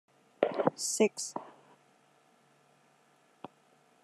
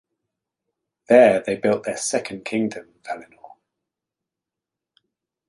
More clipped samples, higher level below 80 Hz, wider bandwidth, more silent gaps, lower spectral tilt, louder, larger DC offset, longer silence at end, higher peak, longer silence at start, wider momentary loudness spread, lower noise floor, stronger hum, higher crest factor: neither; second, -90 dBFS vs -66 dBFS; first, 13 kHz vs 11.5 kHz; neither; second, -3 dB/octave vs -4.5 dB/octave; second, -32 LUFS vs -20 LUFS; neither; first, 2.55 s vs 2 s; second, -8 dBFS vs -2 dBFS; second, 0.4 s vs 1.1 s; first, 24 LU vs 20 LU; second, -67 dBFS vs -87 dBFS; neither; first, 28 dB vs 22 dB